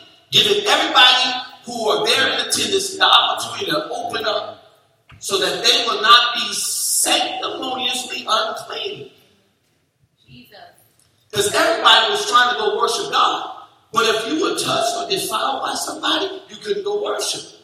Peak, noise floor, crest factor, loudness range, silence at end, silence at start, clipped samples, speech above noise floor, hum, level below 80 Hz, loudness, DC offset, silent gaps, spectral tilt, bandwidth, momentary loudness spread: 0 dBFS; -64 dBFS; 20 dB; 9 LU; 0.15 s; 0.3 s; under 0.1%; 46 dB; none; -64 dBFS; -17 LUFS; under 0.1%; none; -0.5 dB/octave; 16 kHz; 14 LU